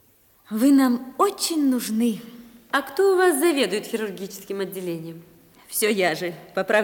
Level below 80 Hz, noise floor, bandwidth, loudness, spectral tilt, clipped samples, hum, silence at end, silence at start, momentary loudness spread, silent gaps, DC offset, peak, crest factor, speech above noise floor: -70 dBFS; -56 dBFS; 18 kHz; -22 LUFS; -3.5 dB/octave; under 0.1%; none; 0 s; 0.5 s; 14 LU; none; under 0.1%; -6 dBFS; 16 dB; 34 dB